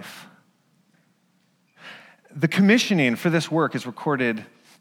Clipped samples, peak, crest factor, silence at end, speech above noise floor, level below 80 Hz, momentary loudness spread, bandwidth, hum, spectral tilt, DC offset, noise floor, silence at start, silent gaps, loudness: under 0.1%; -6 dBFS; 18 dB; 0.35 s; 44 dB; -76 dBFS; 25 LU; 16.5 kHz; none; -5.5 dB/octave; under 0.1%; -65 dBFS; 0 s; none; -21 LUFS